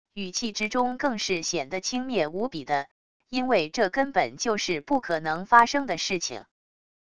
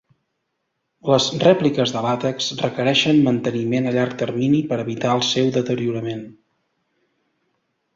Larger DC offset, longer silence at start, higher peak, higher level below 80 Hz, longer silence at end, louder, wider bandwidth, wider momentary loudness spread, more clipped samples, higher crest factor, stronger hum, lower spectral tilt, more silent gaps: first, 0.4% vs under 0.1%; second, 0.05 s vs 1.05 s; about the same, -2 dBFS vs -2 dBFS; about the same, -60 dBFS vs -60 dBFS; second, 0.7 s vs 1.65 s; second, -26 LUFS vs -19 LUFS; first, 11 kHz vs 7.8 kHz; about the same, 10 LU vs 8 LU; neither; first, 24 dB vs 18 dB; neither; second, -3 dB/octave vs -5 dB/octave; first, 2.91-3.20 s vs none